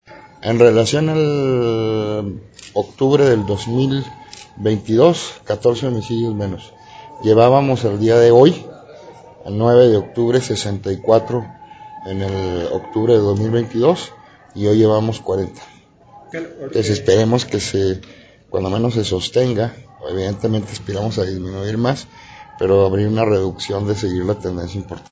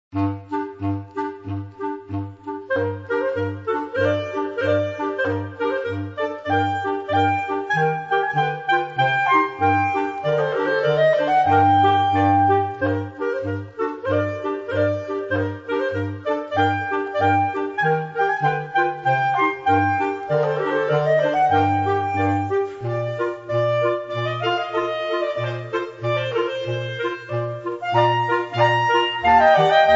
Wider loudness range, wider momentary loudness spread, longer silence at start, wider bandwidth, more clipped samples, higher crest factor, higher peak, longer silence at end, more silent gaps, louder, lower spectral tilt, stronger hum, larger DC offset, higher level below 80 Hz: about the same, 6 LU vs 6 LU; first, 16 LU vs 10 LU; about the same, 0.1 s vs 0.15 s; about the same, 8 kHz vs 7.8 kHz; neither; about the same, 16 dB vs 18 dB; first, 0 dBFS vs -4 dBFS; about the same, 0.1 s vs 0 s; neither; first, -17 LUFS vs -21 LUFS; about the same, -6.5 dB/octave vs -7 dB/octave; neither; neither; first, -42 dBFS vs -56 dBFS